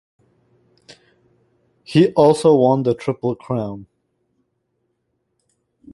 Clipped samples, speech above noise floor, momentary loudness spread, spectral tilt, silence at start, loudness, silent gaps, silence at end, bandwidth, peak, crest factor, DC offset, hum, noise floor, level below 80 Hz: under 0.1%; 55 dB; 12 LU; -7 dB/octave; 1.9 s; -17 LUFS; none; 2.1 s; 11.5 kHz; -2 dBFS; 18 dB; under 0.1%; none; -71 dBFS; -58 dBFS